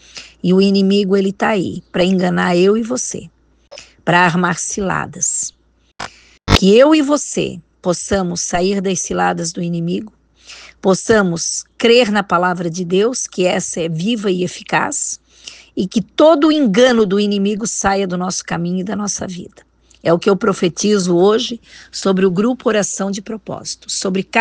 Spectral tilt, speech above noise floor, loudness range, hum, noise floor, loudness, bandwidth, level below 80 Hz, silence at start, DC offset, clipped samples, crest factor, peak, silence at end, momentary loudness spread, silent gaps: -4.5 dB/octave; 25 dB; 4 LU; none; -40 dBFS; -16 LUFS; 10 kHz; -40 dBFS; 0.15 s; under 0.1%; under 0.1%; 16 dB; 0 dBFS; 0 s; 13 LU; none